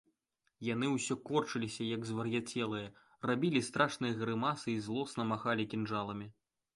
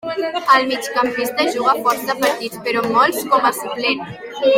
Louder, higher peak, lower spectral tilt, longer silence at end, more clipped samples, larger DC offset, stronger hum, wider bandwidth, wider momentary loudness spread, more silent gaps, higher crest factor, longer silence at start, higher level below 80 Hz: second, -36 LUFS vs -17 LUFS; second, -16 dBFS vs 0 dBFS; first, -5 dB/octave vs -3 dB/octave; first, 0.45 s vs 0 s; neither; neither; neither; second, 11.5 kHz vs 16.5 kHz; about the same, 9 LU vs 7 LU; neither; about the same, 20 dB vs 16 dB; first, 0.6 s vs 0.05 s; second, -72 dBFS vs -62 dBFS